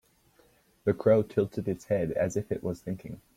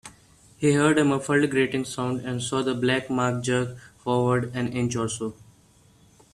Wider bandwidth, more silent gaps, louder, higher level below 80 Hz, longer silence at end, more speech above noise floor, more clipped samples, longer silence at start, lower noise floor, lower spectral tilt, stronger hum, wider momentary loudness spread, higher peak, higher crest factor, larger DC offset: first, 16 kHz vs 13 kHz; neither; second, -29 LUFS vs -25 LUFS; about the same, -60 dBFS vs -58 dBFS; second, 0.2 s vs 1 s; about the same, 35 dB vs 33 dB; neither; first, 0.85 s vs 0.05 s; first, -64 dBFS vs -57 dBFS; first, -7.5 dB/octave vs -5.5 dB/octave; neither; first, 12 LU vs 8 LU; second, -12 dBFS vs -8 dBFS; about the same, 18 dB vs 18 dB; neither